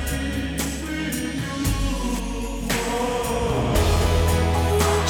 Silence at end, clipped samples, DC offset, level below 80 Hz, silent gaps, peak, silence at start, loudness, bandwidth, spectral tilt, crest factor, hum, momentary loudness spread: 0 s; under 0.1%; under 0.1%; -28 dBFS; none; -8 dBFS; 0 s; -23 LUFS; 20 kHz; -5 dB/octave; 14 dB; none; 7 LU